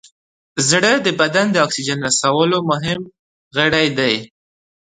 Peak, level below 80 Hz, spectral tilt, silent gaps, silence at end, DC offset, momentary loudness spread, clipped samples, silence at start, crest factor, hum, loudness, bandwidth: 0 dBFS; -54 dBFS; -3 dB/octave; 3.19-3.51 s; 0.6 s; under 0.1%; 10 LU; under 0.1%; 0.55 s; 18 dB; none; -16 LUFS; 11 kHz